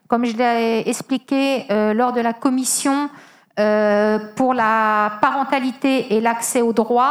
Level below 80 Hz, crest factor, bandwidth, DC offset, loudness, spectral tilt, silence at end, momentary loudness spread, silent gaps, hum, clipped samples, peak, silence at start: -70 dBFS; 18 dB; 15.5 kHz; under 0.1%; -18 LUFS; -3.5 dB/octave; 0 s; 5 LU; none; none; under 0.1%; 0 dBFS; 0.1 s